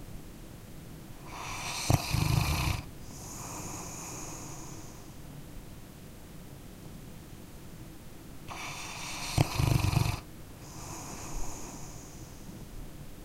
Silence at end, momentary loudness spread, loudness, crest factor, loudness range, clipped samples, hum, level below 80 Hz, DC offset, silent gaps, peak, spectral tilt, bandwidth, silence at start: 0 s; 20 LU; -34 LUFS; 28 dB; 14 LU; under 0.1%; none; -44 dBFS; under 0.1%; none; -8 dBFS; -4.5 dB/octave; 16 kHz; 0 s